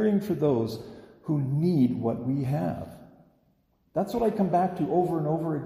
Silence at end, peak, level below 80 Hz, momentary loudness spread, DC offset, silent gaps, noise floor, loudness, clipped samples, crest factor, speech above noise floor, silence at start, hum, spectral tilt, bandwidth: 0 s; -12 dBFS; -58 dBFS; 12 LU; under 0.1%; none; -68 dBFS; -27 LUFS; under 0.1%; 16 dB; 42 dB; 0 s; none; -9 dB/octave; 15.5 kHz